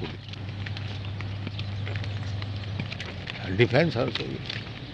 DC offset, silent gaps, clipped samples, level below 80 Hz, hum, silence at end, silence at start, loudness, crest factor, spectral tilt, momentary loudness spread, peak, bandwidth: under 0.1%; none; under 0.1%; -50 dBFS; none; 0 s; 0 s; -30 LUFS; 24 dB; -7 dB/octave; 12 LU; -6 dBFS; 7.8 kHz